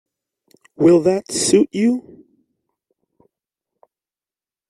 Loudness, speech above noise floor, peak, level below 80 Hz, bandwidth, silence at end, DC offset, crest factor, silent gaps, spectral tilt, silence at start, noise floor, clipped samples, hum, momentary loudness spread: -16 LUFS; over 74 dB; -2 dBFS; -62 dBFS; 12.5 kHz; 2.7 s; under 0.1%; 18 dB; none; -5 dB/octave; 0.8 s; under -90 dBFS; under 0.1%; none; 6 LU